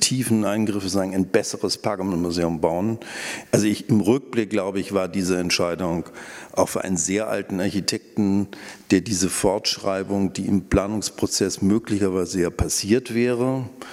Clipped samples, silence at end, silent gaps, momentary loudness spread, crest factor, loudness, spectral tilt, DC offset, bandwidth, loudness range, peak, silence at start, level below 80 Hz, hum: under 0.1%; 0 s; none; 5 LU; 20 dB; -23 LUFS; -4.5 dB/octave; under 0.1%; 16 kHz; 2 LU; -2 dBFS; 0 s; -46 dBFS; none